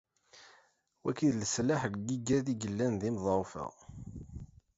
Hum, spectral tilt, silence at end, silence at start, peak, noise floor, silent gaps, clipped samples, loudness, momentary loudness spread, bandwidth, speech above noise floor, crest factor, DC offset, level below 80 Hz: none; -5.5 dB/octave; 0.3 s; 0.35 s; -18 dBFS; -68 dBFS; none; under 0.1%; -33 LUFS; 17 LU; 8 kHz; 36 dB; 18 dB; under 0.1%; -58 dBFS